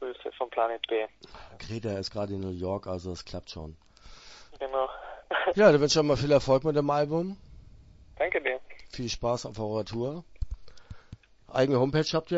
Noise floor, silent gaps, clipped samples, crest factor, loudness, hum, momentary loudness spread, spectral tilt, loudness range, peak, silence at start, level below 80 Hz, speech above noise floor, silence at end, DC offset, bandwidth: -52 dBFS; none; under 0.1%; 24 dB; -28 LUFS; none; 21 LU; -5.5 dB/octave; 11 LU; -4 dBFS; 0 s; -50 dBFS; 25 dB; 0 s; under 0.1%; 8 kHz